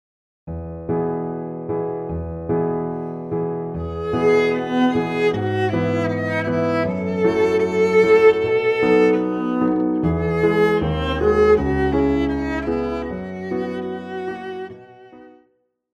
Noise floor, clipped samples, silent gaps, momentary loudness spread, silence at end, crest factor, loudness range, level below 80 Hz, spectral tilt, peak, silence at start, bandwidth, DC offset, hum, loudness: -64 dBFS; under 0.1%; none; 13 LU; 0.65 s; 18 dB; 8 LU; -38 dBFS; -7.5 dB/octave; -2 dBFS; 0.45 s; 8 kHz; under 0.1%; none; -20 LUFS